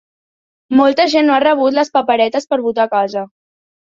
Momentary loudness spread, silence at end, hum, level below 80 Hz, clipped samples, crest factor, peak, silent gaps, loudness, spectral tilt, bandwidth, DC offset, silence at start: 7 LU; 0.6 s; none; -60 dBFS; under 0.1%; 14 dB; 0 dBFS; none; -14 LUFS; -4 dB/octave; 7.6 kHz; under 0.1%; 0.7 s